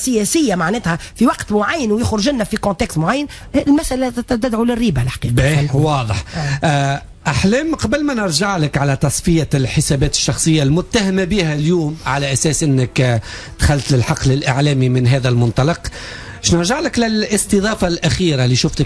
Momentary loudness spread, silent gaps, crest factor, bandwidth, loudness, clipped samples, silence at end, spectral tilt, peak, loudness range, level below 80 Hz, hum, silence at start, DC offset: 5 LU; none; 12 dB; 11 kHz; -16 LUFS; under 0.1%; 0 s; -5 dB/octave; -2 dBFS; 2 LU; -32 dBFS; none; 0 s; under 0.1%